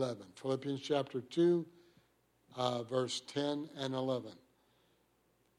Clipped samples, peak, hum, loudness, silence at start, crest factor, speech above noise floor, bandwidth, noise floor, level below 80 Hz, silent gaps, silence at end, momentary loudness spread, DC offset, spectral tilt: under 0.1%; -18 dBFS; none; -37 LUFS; 0 s; 20 dB; 38 dB; 12 kHz; -74 dBFS; -82 dBFS; none; 1.25 s; 10 LU; under 0.1%; -5.5 dB/octave